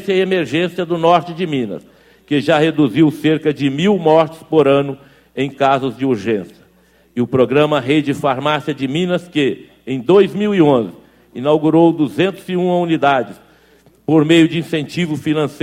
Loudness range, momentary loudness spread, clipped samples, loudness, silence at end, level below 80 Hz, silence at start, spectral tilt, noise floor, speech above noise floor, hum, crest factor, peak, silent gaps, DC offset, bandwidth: 3 LU; 10 LU; under 0.1%; -15 LUFS; 0.05 s; -56 dBFS; 0 s; -7 dB/octave; -52 dBFS; 37 dB; none; 16 dB; 0 dBFS; none; under 0.1%; 14 kHz